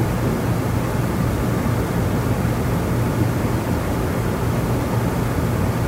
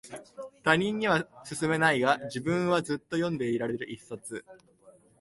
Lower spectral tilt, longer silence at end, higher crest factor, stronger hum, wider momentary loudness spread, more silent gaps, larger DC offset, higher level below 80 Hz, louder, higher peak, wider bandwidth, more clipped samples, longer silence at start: first, -7 dB/octave vs -5 dB/octave; second, 0 s vs 0.3 s; second, 12 dB vs 22 dB; neither; second, 1 LU vs 16 LU; neither; neither; first, -30 dBFS vs -64 dBFS; first, -21 LUFS vs -28 LUFS; about the same, -8 dBFS vs -8 dBFS; first, 16 kHz vs 11.5 kHz; neither; about the same, 0 s vs 0.05 s